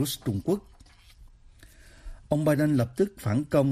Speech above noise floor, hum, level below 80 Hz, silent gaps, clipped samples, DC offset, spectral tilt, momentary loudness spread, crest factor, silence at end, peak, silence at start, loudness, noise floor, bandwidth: 28 dB; none; -50 dBFS; none; under 0.1%; under 0.1%; -6.5 dB/octave; 7 LU; 18 dB; 0 s; -10 dBFS; 0 s; -27 LUFS; -53 dBFS; 15.5 kHz